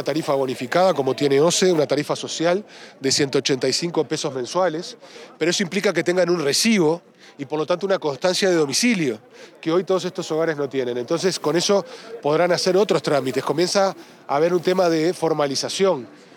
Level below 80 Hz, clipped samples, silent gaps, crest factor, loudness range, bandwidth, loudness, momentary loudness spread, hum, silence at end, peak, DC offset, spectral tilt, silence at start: -78 dBFS; under 0.1%; none; 14 dB; 2 LU; 18.5 kHz; -21 LUFS; 8 LU; none; 0.2 s; -6 dBFS; under 0.1%; -4 dB/octave; 0 s